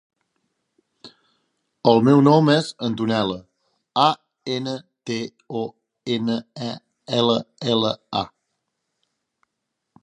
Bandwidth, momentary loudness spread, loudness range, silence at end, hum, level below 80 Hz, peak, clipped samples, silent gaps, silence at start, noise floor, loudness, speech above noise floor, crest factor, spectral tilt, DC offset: 11 kHz; 17 LU; 6 LU; 1.75 s; none; -62 dBFS; 0 dBFS; under 0.1%; none; 1.05 s; -79 dBFS; -21 LUFS; 59 dB; 22 dB; -6.5 dB/octave; under 0.1%